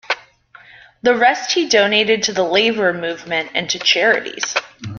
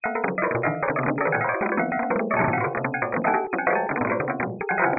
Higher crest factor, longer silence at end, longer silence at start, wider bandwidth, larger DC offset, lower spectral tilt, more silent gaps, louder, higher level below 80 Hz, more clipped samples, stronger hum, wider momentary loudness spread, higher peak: about the same, 16 dB vs 16 dB; about the same, 0 s vs 0 s; about the same, 0.1 s vs 0.05 s; first, 7.2 kHz vs 2.7 kHz; neither; second, -2 dB/octave vs -13 dB/octave; neither; first, -16 LUFS vs -24 LUFS; about the same, -60 dBFS vs -58 dBFS; neither; neither; first, 9 LU vs 3 LU; first, -2 dBFS vs -8 dBFS